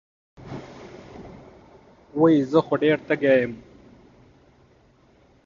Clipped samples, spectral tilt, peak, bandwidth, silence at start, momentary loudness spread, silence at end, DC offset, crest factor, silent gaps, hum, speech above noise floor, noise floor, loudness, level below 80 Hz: under 0.1%; -8 dB/octave; -6 dBFS; 7.2 kHz; 0.4 s; 24 LU; 1.85 s; under 0.1%; 20 dB; none; none; 38 dB; -57 dBFS; -21 LUFS; -60 dBFS